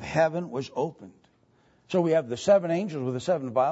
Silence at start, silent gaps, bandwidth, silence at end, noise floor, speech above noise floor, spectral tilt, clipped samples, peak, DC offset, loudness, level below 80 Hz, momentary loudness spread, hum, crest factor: 0 s; none; 8 kHz; 0 s; -63 dBFS; 38 dB; -6.5 dB/octave; under 0.1%; -10 dBFS; under 0.1%; -26 LUFS; -64 dBFS; 10 LU; none; 18 dB